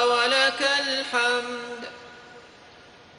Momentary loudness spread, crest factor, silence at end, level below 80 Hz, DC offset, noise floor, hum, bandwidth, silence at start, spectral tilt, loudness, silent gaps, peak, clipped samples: 20 LU; 20 dB; 0.7 s; -70 dBFS; under 0.1%; -50 dBFS; none; 11.5 kHz; 0 s; -0.5 dB/octave; -22 LUFS; none; -6 dBFS; under 0.1%